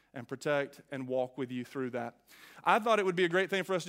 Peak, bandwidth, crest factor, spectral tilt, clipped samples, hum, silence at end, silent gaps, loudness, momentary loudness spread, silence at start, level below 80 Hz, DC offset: -10 dBFS; 16 kHz; 22 dB; -5 dB/octave; under 0.1%; none; 0 s; none; -32 LUFS; 13 LU; 0.15 s; -82 dBFS; under 0.1%